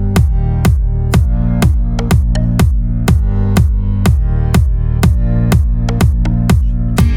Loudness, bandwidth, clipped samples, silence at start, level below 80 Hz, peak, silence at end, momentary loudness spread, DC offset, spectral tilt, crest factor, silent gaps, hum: -13 LUFS; 17 kHz; under 0.1%; 0 s; -14 dBFS; 0 dBFS; 0 s; 2 LU; under 0.1%; -7 dB/octave; 10 dB; none; none